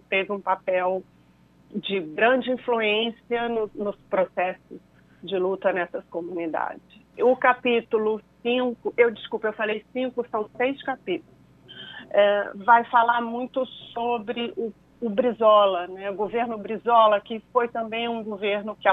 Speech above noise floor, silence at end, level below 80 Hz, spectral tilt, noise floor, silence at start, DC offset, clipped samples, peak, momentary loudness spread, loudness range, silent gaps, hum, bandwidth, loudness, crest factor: 33 dB; 0 s; -66 dBFS; -7 dB/octave; -57 dBFS; 0.1 s; under 0.1%; under 0.1%; -4 dBFS; 13 LU; 5 LU; none; none; 4.1 kHz; -24 LUFS; 20 dB